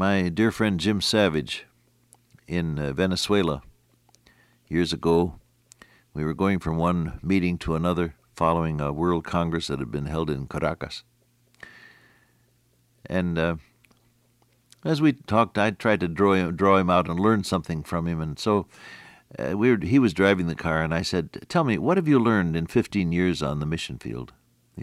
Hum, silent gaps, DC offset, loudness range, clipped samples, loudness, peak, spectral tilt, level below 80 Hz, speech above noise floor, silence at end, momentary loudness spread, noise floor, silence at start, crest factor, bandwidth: none; none; under 0.1%; 9 LU; under 0.1%; -24 LUFS; -6 dBFS; -6 dB/octave; -50 dBFS; 41 dB; 0 s; 11 LU; -64 dBFS; 0 s; 18 dB; 14.5 kHz